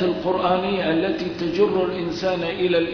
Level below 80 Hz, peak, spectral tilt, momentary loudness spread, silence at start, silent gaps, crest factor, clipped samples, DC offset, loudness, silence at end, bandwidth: -50 dBFS; -6 dBFS; -6.5 dB/octave; 4 LU; 0 s; none; 14 dB; under 0.1%; under 0.1%; -22 LUFS; 0 s; 5.4 kHz